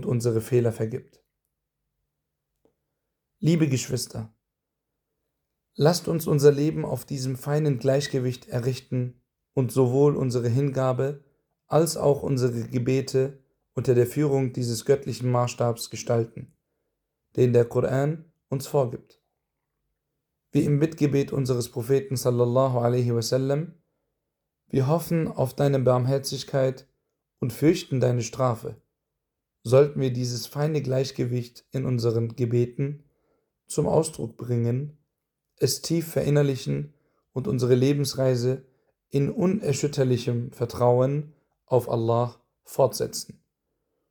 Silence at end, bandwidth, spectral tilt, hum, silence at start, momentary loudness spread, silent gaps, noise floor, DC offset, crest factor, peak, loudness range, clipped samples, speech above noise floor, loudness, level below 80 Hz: 0.9 s; over 20 kHz; -6.5 dB/octave; none; 0 s; 11 LU; none; -83 dBFS; under 0.1%; 20 dB; -6 dBFS; 4 LU; under 0.1%; 59 dB; -25 LUFS; -60 dBFS